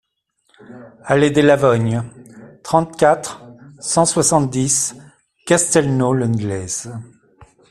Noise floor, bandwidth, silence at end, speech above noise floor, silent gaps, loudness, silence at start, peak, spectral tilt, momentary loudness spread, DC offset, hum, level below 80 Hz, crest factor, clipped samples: -66 dBFS; 13.5 kHz; 0.25 s; 49 dB; none; -16 LUFS; 0.7 s; 0 dBFS; -4.5 dB/octave; 20 LU; under 0.1%; none; -50 dBFS; 18 dB; under 0.1%